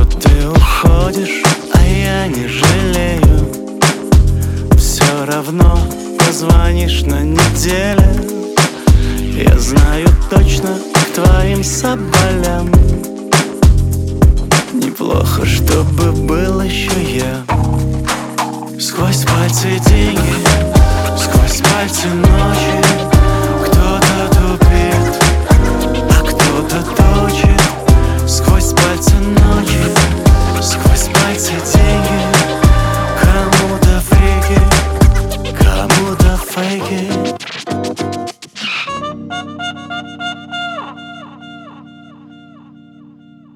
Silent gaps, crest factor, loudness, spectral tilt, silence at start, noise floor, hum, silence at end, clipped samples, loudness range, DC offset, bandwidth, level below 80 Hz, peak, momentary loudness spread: none; 12 dB; -12 LUFS; -5 dB/octave; 0 s; -40 dBFS; none; 1.7 s; under 0.1%; 8 LU; under 0.1%; 17 kHz; -14 dBFS; 0 dBFS; 9 LU